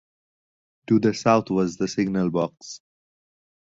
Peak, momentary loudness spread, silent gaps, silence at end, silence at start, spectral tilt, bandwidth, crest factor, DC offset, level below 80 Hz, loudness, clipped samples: -2 dBFS; 19 LU; none; 0.9 s; 0.9 s; -6.5 dB/octave; 7.8 kHz; 22 dB; under 0.1%; -60 dBFS; -23 LUFS; under 0.1%